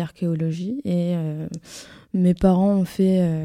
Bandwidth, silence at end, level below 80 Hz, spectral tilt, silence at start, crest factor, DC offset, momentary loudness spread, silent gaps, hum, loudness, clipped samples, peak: 11.5 kHz; 0 s; -46 dBFS; -8.5 dB/octave; 0 s; 18 dB; under 0.1%; 16 LU; none; none; -22 LUFS; under 0.1%; -4 dBFS